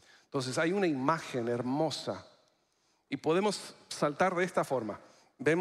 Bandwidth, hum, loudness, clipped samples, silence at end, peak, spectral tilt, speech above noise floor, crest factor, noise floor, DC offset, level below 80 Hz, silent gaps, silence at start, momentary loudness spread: 14.5 kHz; none; -32 LUFS; under 0.1%; 0 s; -12 dBFS; -5 dB/octave; 42 dB; 22 dB; -74 dBFS; under 0.1%; -76 dBFS; none; 0.35 s; 12 LU